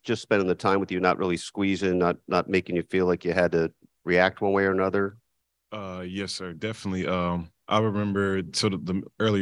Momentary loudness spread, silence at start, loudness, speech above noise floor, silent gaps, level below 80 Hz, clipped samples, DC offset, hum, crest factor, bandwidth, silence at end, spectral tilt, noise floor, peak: 10 LU; 0.05 s; -26 LUFS; 46 dB; none; -58 dBFS; under 0.1%; under 0.1%; none; 22 dB; 11.5 kHz; 0 s; -5.5 dB/octave; -71 dBFS; -4 dBFS